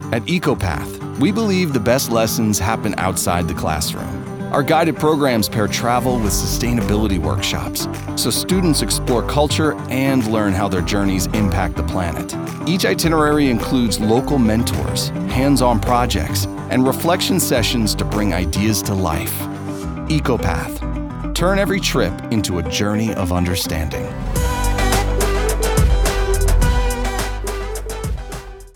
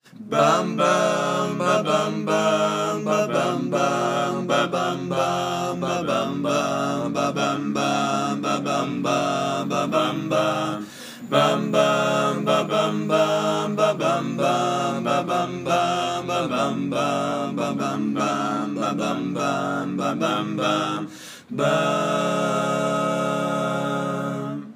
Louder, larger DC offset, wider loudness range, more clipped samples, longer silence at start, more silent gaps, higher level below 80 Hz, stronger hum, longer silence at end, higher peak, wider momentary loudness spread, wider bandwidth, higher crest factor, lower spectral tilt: first, -18 LUFS vs -23 LUFS; neither; about the same, 3 LU vs 3 LU; neither; second, 0 s vs 0.15 s; neither; first, -26 dBFS vs -70 dBFS; neither; about the same, 0.05 s vs 0 s; first, 0 dBFS vs -4 dBFS; first, 8 LU vs 5 LU; first, over 20 kHz vs 15.5 kHz; about the same, 18 dB vs 20 dB; about the same, -5 dB/octave vs -5 dB/octave